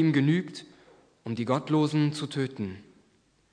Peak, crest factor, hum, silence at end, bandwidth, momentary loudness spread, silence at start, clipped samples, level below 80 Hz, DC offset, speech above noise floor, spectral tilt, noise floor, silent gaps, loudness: -12 dBFS; 18 dB; none; 0.7 s; 10.5 kHz; 18 LU; 0 s; under 0.1%; -74 dBFS; under 0.1%; 39 dB; -7 dB/octave; -66 dBFS; none; -28 LUFS